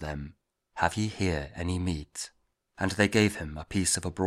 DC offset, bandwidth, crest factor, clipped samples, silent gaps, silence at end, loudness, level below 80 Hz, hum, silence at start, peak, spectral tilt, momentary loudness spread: under 0.1%; 15.5 kHz; 22 dB; under 0.1%; none; 0 s; -29 LUFS; -46 dBFS; none; 0 s; -8 dBFS; -4.5 dB/octave; 15 LU